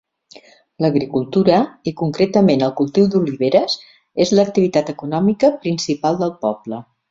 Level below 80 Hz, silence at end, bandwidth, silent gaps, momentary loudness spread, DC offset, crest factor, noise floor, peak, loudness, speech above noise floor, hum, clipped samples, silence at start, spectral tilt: -56 dBFS; 0.3 s; 7.8 kHz; none; 9 LU; under 0.1%; 16 dB; -46 dBFS; -2 dBFS; -17 LUFS; 30 dB; none; under 0.1%; 0.8 s; -6.5 dB/octave